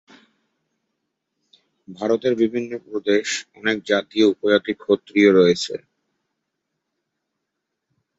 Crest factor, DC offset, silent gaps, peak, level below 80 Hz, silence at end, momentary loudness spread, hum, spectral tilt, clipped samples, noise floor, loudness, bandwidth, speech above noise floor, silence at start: 20 dB; under 0.1%; none; -2 dBFS; -66 dBFS; 2.4 s; 13 LU; none; -4.5 dB/octave; under 0.1%; -80 dBFS; -20 LUFS; 8 kHz; 60 dB; 1.9 s